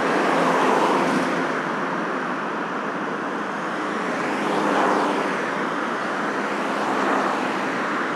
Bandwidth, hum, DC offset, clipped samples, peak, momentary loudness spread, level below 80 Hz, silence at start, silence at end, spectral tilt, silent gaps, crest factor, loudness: 13.5 kHz; none; under 0.1%; under 0.1%; -6 dBFS; 7 LU; -82 dBFS; 0 s; 0 s; -4.5 dB/octave; none; 16 dB; -23 LUFS